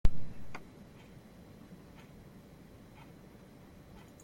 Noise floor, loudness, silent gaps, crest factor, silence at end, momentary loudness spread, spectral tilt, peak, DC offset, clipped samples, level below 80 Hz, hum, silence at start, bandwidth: -55 dBFS; -51 LUFS; none; 22 dB; 3.65 s; 6 LU; -6.5 dB/octave; -10 dBFS; under 0.1%; under 0.1%; -42 dBFS; none; 0.05 s; 7.2 kHz